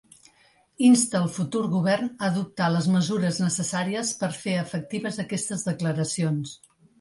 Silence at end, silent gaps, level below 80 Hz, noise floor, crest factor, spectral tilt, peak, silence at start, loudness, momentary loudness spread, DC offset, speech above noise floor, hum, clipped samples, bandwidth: 0.45 s; none; -66 dBFS; -61 dBFS; 18 dB; -5 dB/octave; -8 dBFS; 0.8 s; -25 LUFS; 9 LU; under 0.1%; 37 dB; none; under 0.1%; 11.5 kHz